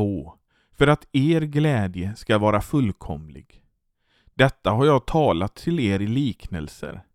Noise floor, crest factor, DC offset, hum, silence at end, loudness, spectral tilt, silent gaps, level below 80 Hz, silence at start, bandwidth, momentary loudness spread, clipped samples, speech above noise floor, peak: -68 dBFS; 22 dB; under 0.1%; none; 0.15 s; -22 LUFS; -7 dB/octave; none; -42 dBFS; 0 s; 14.5 kHz; 15 LU; under 0.1%; 46 dB; -2 dBFS